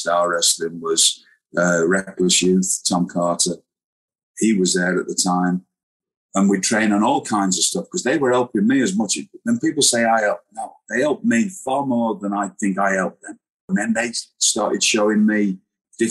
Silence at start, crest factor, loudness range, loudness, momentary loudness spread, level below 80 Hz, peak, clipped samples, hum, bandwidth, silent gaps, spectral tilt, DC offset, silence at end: 0 s; 16 dB; 3 LU; -19 LUFS; 9 LU; -64 dBFS; -4 dBFS; under 0.1%; none; 13.5 kHz; 3.84-4.08 s, 4.23-4.34 s, 5.83-6.00 s, 6.17-6.29 s, 13.50-13.68 s; -3.5 dB/octave; under 0.1%; 0 s